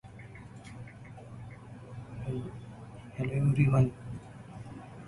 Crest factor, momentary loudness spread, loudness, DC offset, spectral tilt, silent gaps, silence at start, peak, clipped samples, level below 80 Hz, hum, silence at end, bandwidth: 20 dB; 22 LU; -31 LUFS; under 0.1%; -9 dB/octave; none; 0.05 s; -14 dBFS; under 0.1%; -54 dBFS; none; 0 s; 11 kHz